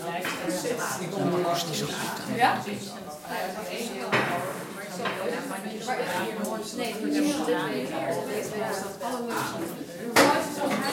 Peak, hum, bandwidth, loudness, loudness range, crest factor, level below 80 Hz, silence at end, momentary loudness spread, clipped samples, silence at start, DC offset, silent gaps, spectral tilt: -4 dBFS; none; 16.5 kHz; -28 LUFS; 3 LU; 24 dB; -70 dBFS; 0 s; 10 LU; under 0.1%; 0 s; under 0.1%; none; -4 dB/octave